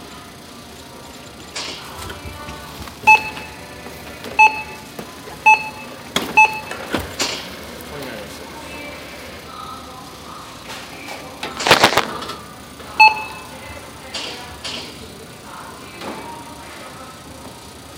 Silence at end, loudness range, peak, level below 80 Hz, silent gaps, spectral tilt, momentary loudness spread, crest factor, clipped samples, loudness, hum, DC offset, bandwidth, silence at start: 0 s; 16 LU; 0 dBFS; -48 dBFS; none; -2 dB/octave; 23 LU; 22 dB; under 0.1%; -17 LUFS; none; under 0.1%; 17 kHz; 0 s